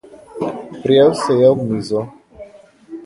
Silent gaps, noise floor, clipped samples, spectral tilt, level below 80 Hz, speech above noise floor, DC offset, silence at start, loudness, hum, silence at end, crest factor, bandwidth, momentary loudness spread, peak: none; -42 dBFS; under 0.1%; -6.5 dB/octave; -54 dBFS; 28 dB; under 0.1%; 0.35 s; -16 LUFS; none; 0 s; 16 dB; 11.5 kHz; 20 LU; 0 dBFS